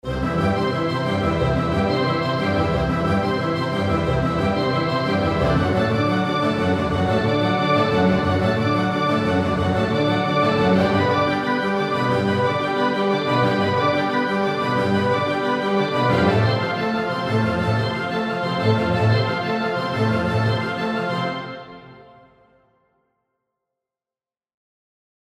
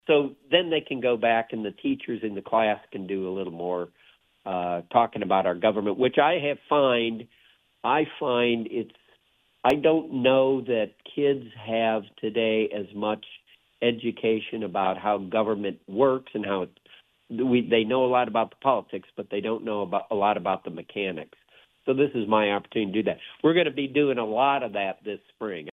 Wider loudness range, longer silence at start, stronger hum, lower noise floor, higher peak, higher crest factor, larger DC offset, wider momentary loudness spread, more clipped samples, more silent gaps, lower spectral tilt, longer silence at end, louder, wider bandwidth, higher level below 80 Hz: about the same, 4 LU vs 4 LU; about the same, 0.05 s vs 0.05 s; neither; first, under -90 dBFS vs -66 dBFS; about the same, -4 dBFS vs -4 dBFS; about the same, 16 dB vs 20 dB; neither; second, 4 LU vs 11 LU; neither; neither; about the same, -7 dB/octave vs -7.5 dB/octave; first, 3.4 s vs 0 s; first, -20 LUFS vs -25 LUFS; first, 12.5 kHz vs 6.8 kHz; first, -42 dBFS vs -68 dBFS